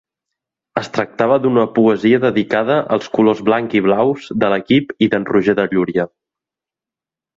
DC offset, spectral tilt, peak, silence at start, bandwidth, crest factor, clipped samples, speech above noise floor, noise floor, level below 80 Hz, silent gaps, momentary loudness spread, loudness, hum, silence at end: under 0.1%; -7 dB/octave; -2 dBFS; 0.75 s; 7.6 kHz; 14 dB; under 0.1%; 74 dB; -88 dBFS; -56 dBFS; none; 7 LU; -16 LUFS; none; 1.3 s